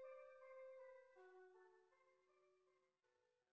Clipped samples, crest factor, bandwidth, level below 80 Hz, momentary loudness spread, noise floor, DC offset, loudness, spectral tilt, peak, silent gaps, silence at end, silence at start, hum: under 0.1%; 14 dB; 5.8 kHz; under -90 dBFS; 7 LU; -87 dBFS; under 0.1%; -64 LUFS; -1.5 dB/octave; -52 dBFS; none; 0 s; 0 s; none